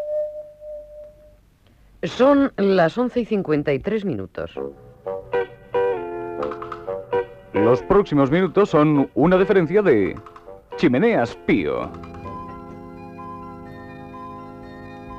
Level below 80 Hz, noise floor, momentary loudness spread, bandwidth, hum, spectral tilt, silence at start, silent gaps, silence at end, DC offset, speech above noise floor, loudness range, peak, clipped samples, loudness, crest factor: -48 dBFS; -54 dBFS; 21 LU; 8 kHz; none; -8 dB/octave; 0 s; none; 0 s; under 0.1%; 35 dB; 9 LU; -6 dBFS; under 0.1%; -20 LUFS; 16 dB